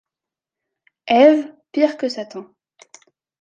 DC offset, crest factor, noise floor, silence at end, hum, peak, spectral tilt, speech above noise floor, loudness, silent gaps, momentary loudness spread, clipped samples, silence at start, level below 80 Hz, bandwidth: under 0.1%; 18 dB; -88 dBFS; 1 s; none; -2 dBFS; -4.5 dB/octave; 71 dB; -17 LUFS; none; 22 LU; under 0.1%; 1.05 s; -72 dBFS; 7.8 kHz